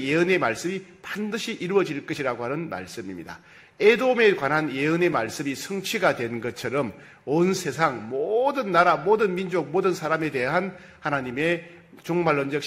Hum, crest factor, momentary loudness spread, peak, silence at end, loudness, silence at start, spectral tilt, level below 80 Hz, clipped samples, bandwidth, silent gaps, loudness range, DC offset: none; 20 dB; 14 LU; -4 dBFS; 0 s; -24 LUFS; 0 s; -5 dB/octave; -64 dBFS; under 0.1%; 16 kHz; none; 3 LU; under 0.1%